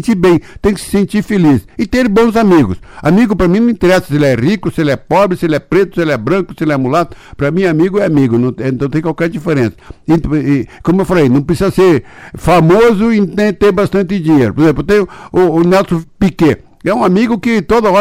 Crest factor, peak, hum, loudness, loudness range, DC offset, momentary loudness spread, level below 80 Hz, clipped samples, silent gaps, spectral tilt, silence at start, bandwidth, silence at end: 8 dB; -2 dBFS; none; -12 LUFS; 3 LU; under 0.1%; 6 LU; -34 dBFS; under 0.1%; none; -7.5 dB/octave; 0 s; 16 kHz; 0 s